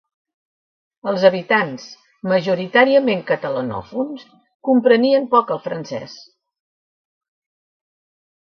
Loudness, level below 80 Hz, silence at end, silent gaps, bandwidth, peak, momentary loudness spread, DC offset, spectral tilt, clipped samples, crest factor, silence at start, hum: -18 LUFS; -64 dBFS; 2.2 s; 4.55-4.60 s; 6.6 kHz; 0 dBFS; 16 LU; under 0.1%; -6 dB/octave; under 0.1%; 20 dB; 1.05 s; none